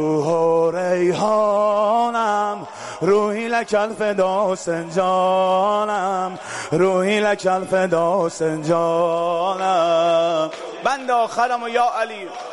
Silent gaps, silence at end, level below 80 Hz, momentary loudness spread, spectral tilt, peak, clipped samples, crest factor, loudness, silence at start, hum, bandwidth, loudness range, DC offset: none; 0 s; -64 dBFS; 7 LU; -5 dB/octave; -8 dBFS; under 0.1%; 12 dB; -19 LUFS; 0 s; none; 11.5 kHz; 1 LU; under 0.1%